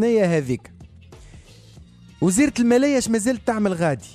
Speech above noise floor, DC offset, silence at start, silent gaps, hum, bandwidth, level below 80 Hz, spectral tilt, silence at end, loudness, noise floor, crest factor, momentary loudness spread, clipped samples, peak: 27 dB; under 0.1%; 0 s; none; none; 14 kHz; -50 dBFS; -5.5 dB/octave; 0.05 s; -20 LUFS; -46 dBFS; 16 dB; 6 LU; under 0.1%; -6 dBFS